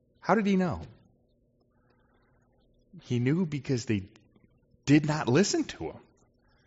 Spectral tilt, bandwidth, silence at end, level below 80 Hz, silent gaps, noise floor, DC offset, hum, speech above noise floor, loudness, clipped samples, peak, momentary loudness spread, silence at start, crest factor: -6 dB/octave; 8 kHz; 0.7 s; -62 dBFS; none; -69 dBFS; under 0.1%; none; 42 dB; -28 LUFS; under 0.1%; -10 dBFS; 16 LU; 0.25 s; 20 dB